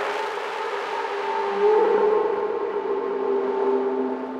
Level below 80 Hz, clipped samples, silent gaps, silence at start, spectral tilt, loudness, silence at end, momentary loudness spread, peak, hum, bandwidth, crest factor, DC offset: -74 dBFS; under 0.1%; none; 0 s; -4.5 dB/octave; -23 LUFS; 0 s; 8 LU; -10 dBFS; none; 9 kHz; 14 dB; under 0.1%